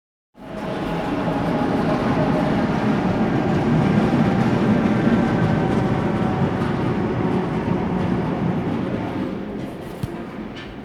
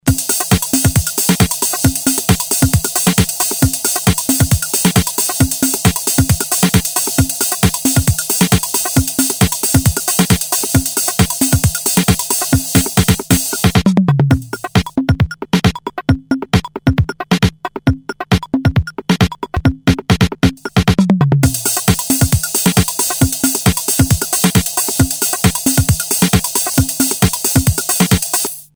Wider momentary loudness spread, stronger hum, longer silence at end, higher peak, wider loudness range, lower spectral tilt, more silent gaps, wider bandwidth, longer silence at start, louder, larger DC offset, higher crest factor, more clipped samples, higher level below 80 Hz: first, 12 LU vs 4 LU; neither; second, 0 s vs 0.15 s; second, -6 dBFS vs 0 dBFS; about the same, 5 LU vs 3 LU; first, -8 dB/octave vs -4 dB/octave; neither; second, 12.5 kHz vs over 20 kHz; first, 0.4 s vs 0.05 s; second, -21 LUFS vs -14 LUFS; neither; about the same, 14 dB vs 14 dB; neither; second, -40 dBFS vs -28 dBFS